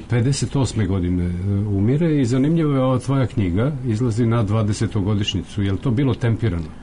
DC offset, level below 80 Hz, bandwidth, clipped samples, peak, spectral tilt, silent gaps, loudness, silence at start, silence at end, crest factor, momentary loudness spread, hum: under 0.1%; -38 dBFS; 11 kHz; under 0.1%; -12 dBFS; -7 dB/octave; none; -20 LUFS; 0 s; 0 s; 8 dB; 4 LU; none